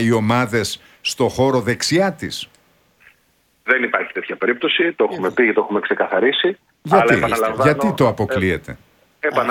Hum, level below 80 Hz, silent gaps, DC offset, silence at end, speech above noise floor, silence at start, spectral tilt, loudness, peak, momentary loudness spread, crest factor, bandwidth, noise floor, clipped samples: none; -50 dBFS; none; under 0.1%; 0 s; 43 dB; 0 s; -5 dB/octave; -18 LUFS; 0 dBFS; 9 LU; 18 dB; 17.5 kHz; -61 dBFS; under 0.1%